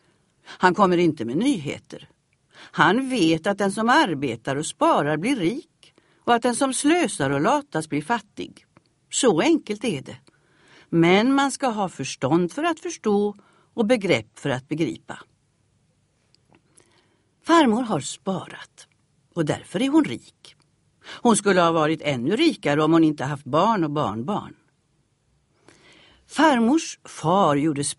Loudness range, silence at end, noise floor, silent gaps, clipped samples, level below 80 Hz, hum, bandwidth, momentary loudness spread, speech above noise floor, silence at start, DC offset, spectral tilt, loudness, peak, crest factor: 5 LU; 0.05 s; -67 dBFS; none; under 0.1%; -62 dBFS; none; 11.5 kHz; 15 LU; 45 dB; 0.5 s; under 0.1%; -5 dB/octave; -22 LUFS; -2 dBFS; 22 dB